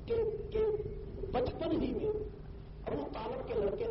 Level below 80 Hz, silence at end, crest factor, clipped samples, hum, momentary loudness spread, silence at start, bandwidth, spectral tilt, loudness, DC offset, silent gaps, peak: -48 dBFS; 0 s; 14 dB; under 0.1%; none; 11 LU; 0 s; 5.8 kHz; -6.5 dB/octave; -36 LUFS; under 0.1%; none; -22 dBFS